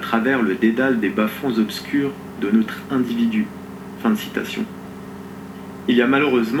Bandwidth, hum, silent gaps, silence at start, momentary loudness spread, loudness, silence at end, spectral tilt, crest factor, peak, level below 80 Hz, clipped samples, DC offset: 16.5 kHz; none; none; 0 s; 18 LU; -20 LUFS; 0 s; -6 dB/octave; 16 dB; -4 dBFS; -58 dBFS; under 0.1%; under 0.1%